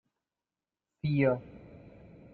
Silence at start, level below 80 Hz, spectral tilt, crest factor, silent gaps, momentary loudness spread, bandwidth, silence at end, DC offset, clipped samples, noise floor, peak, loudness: 1.05 s; -64 dBFS; -11 dB/octave; 22 dB; none; 24 LU; 4.6 kHz; 0.45 s; under 0.1%; under 0.1%; under -90 dBFS; -14 dBFS; -31 LUFS